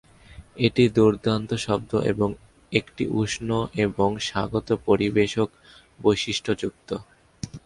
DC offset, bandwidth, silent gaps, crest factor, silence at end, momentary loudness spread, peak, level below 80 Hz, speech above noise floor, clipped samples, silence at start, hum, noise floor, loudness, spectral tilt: under 0.1%; 11.5 kHz; none; 22 dB; 0.05 s; 10 LU; -4 dBFS; -50 dBFS; 24 dB; under 0.1%; 0.3 s; none; -47 dBFS; -24 LUFS; -5.5 dB/octave